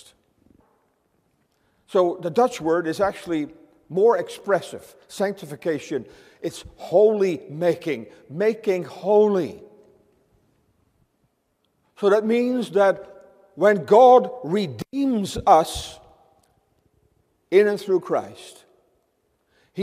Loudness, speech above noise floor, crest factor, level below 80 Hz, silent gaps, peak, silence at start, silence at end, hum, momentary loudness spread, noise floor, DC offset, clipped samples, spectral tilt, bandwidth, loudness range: -21 LUFS; 50 dB; 20 dB; -56 dBFS; none; -2 dBFS; 1.9 s; 0 s; none; 16 LU; -70 dBFS; under 0.1%; under 0.1%; -5.5 dB/octave; 15 kHz; 7 LU